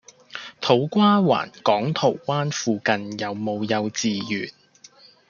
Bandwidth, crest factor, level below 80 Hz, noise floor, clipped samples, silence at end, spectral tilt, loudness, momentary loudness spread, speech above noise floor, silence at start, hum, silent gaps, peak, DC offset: 7.2 kHz; 20 dB; -68 dBFS; -51 dBFS; under 0.1%; 0.8 s; -5 dB/octave; -22 LUFS; 11 LU; 29 dB; 0.35 s; none; none; -2 dBFS; under 0.1%